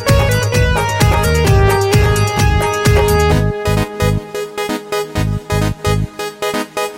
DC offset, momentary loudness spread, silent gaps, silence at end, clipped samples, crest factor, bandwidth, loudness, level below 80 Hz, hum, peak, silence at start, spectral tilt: under 0.1%; 8 LU; none; 0 s; under 0.1%; 12 dB; 17 kHz; -15 LUFS; -22 dBFS; none; 0 dBFS; 0 s; -5.5 dB/octave